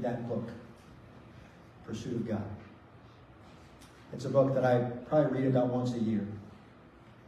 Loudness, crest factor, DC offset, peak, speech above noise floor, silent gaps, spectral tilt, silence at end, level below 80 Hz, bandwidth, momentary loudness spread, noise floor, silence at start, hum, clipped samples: -31 LUFS; 20 dB; under 0.1%; -14 dBFS; 25 dB; none; -8 dB/octave; 0.2 s; -64 dBFS; 11 kHz; 26 LU; -55 dBFS; 0 s; none; under 0.1%